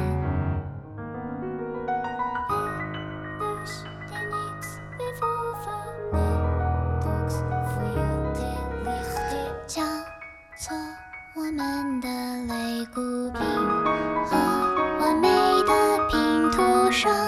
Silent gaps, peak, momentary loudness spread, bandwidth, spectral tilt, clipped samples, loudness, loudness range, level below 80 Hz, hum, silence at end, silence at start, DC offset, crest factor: none; -8 dBFS; 15 LU; 15.5 kHz; -5.5 dB/octave; under 0.1%; -26 LUFS; 9 LU; -38 dBFS; none; 0 s; 0 s; under 0.1%; 18 dB